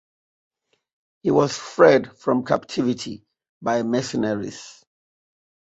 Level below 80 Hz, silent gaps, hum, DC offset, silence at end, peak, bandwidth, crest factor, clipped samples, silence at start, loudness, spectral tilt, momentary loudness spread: -62 dBFS; 3.49-3.61 s; none; under 0.1%; 1.05 s; -2 dBFS; 8.2 kHz; 22 dB; under 0.1%; 1.25 s; -21 LUFS; -5.5 dB/octave; 17 LU